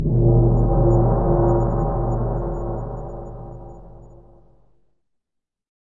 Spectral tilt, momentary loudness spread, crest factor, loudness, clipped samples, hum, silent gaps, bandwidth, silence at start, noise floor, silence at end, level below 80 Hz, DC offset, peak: -12.5 dB/octave; 20 LU; 16 dB; -20 LUFS; under 0.1%; none; none; 1.9 kHz; 0 s; -80 dBFS; 1.75 s; -26 dBFS; 0.5%; -4 dBFS